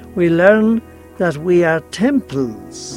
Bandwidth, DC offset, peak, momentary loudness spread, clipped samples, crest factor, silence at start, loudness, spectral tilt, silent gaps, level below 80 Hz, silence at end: 12.5 kHz; under 0.1%; 0 dBFS; 11 LU; under 0.1%; 16 dB; 0 s; -15 LUFS; -6.5 dB/octave; none; -50 dBFS; 0 s